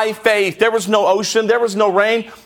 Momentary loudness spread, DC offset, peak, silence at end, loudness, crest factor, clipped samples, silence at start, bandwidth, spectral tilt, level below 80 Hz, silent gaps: 2 LU; under 0.1%; -2 dBFS; 0.1 s; -15 LUFS; 14 dB; under 0.1%; 0 s; 17.5 kHz; -3 dB/octave; -62 dBFS; none